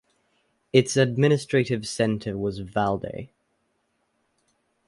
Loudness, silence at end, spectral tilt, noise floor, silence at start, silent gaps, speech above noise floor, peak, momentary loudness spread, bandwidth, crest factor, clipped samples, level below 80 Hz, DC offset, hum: -24 LUFS; 1.6 s; -5.5 dB/octave; -72 dBFS; 0.75 s; none; 49 dB; -4 dBFS; 10 LU; 11.5 kHz; 22 dB; under 0.1%; -56 dBFS; under 0.1%; none